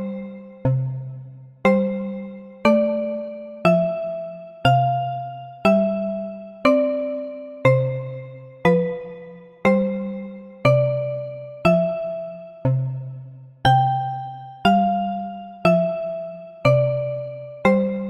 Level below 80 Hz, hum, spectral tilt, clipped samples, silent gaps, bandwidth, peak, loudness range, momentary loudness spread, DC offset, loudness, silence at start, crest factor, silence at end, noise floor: -50 dBFS; none; -8 dB/octave; under 0.1%; none; 9.8 kHz; -6 dBFS; 1 LU; 16 LU; under 0.1%; -21 LUFS; 0 s; 16 dB; 0 s; -41 dBFS